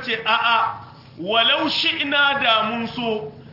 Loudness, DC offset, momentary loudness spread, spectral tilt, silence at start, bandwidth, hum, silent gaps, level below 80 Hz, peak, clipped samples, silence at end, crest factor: -19 LUFS; under 0.1%; 9 LU; -4 dB/octave; 0 s; 5.8 kHz; none; none; -62 dBFS; -4 dBFS; under 0.1%; 0 s; 18 dB